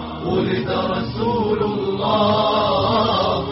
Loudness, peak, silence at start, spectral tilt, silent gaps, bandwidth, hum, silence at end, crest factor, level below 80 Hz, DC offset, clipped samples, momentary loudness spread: -19 LUFS; -6 dBFS; 0 s; -4.5 dB/octave; none; 6 kHz; none; 0 s; 12 dB; -42 dBFS; under 0.1%; under 0.1%; 5 LU